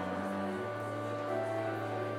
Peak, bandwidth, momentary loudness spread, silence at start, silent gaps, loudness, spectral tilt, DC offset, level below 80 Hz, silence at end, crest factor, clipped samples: -24 dBFS; 16 kHz; 3 LU; 0 s; none; -36 LUFS; -6.5 dB/octave; under 0.1%; -80 dBFS; 0 s; 12 dB; under 0.1%